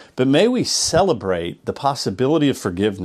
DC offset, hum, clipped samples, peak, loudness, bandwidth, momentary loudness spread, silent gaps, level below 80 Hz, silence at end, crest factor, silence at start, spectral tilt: under 0.1%; none; under 0.1%; -4 dBFS; -19 LUFS; 15 kHz; 7 LU; none; -48 dBFS; 0 s; 16 dB; 0 s; -4.5 dB/octave